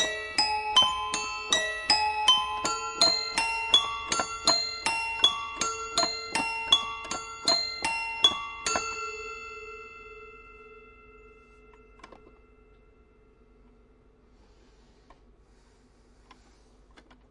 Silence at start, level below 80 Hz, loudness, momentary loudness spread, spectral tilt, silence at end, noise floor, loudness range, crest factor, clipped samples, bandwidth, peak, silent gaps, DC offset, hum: 0 s; -58 dBFS; -25 LUFS; 16 LU; 0 dB/octave; 0.95 s; -60 dBFS; 13 LU; 24 dB; under 0.1%; 11.5 kHz; -6 dBFS; none; under 0.1%; none